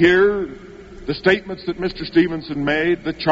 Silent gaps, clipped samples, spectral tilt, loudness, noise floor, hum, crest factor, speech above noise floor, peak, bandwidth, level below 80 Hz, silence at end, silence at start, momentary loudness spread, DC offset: none; under 0.1%; -4 dB/octave; -19 LUFS; -38 dBFS; none; 18 dB; 20 dB; -2 dBFS; 7.6 kHz; -44 dBFS; 0 s; 0 s; 14 LU; under 0.1%